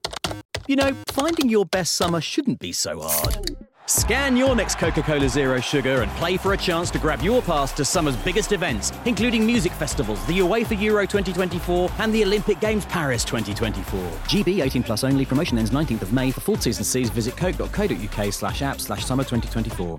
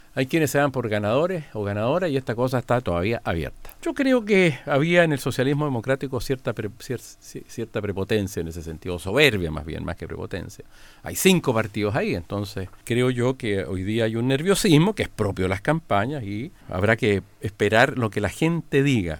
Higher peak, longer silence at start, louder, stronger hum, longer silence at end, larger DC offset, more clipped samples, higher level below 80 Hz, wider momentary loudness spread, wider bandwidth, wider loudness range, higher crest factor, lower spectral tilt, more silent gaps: second, -8 dBFS vs -2 dBFS; about the same, 0.05 s vs 0.15 s; about the same, -22 LUFS vs -23 LUFS; neither; about the same, 0 s vs 0 s; neither; neither; first, -34 dBFS vs -46 dBFS; second, 6 LU vs 14 LU; second, 17 kHz vs 19 kHz; about the same, 2 LU vs 3 LU; second, 14 dB vs 20 dB; about the same, -4.5 dB/octave vs -5.5 dB/octave; first, 0.45-0.49 s vs none